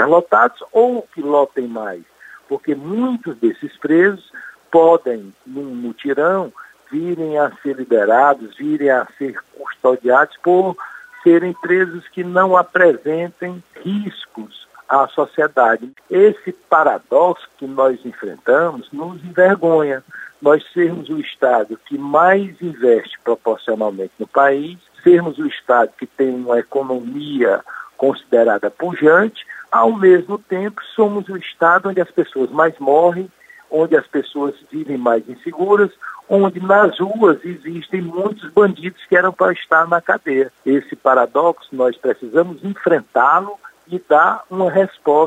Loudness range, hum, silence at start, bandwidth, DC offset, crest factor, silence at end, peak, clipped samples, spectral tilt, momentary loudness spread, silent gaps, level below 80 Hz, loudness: 3 LU; none; 0 s; 9 kHz; under 0.1%; 16 dB; 0 s; 0 dBFS; under 0.1%; -7.5 dB/octave; 14 LU; none; -68 dBFS; -16 LUFS